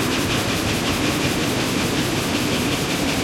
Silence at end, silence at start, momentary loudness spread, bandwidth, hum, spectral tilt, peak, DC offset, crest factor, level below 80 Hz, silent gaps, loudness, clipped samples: 0 s; 0 s; 1 LU; 16.5 kHz; none; -4 dB/octave; -8 dBFS; under 0.1%; 14 dB; -40 dBFS; none; -20 LUFS; under 0.1%